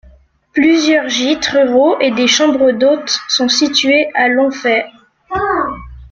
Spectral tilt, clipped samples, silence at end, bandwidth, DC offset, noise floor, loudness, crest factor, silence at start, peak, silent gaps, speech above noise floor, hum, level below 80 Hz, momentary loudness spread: -2.5 dB/octave; under 0.1%; 0.05 s; 7.6 kHz; under 0.1%; -46 dBFS; -12 LUFS; 14 dB; 0.55 s; 0 dBFS; none; 34 dB; none; -44 dBFS; 8 LU